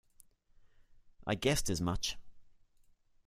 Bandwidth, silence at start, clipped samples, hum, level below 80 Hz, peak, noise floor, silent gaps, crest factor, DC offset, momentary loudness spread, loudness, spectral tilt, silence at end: 15.5 kHz; 0.2 s; under 0.1%; none; -50 dBFS; -16 dBFS; -67 dBFS; none; 22 dB; under 0.1%; 12 LU; -35 LUFS; -4 dB/octave; 0.75 s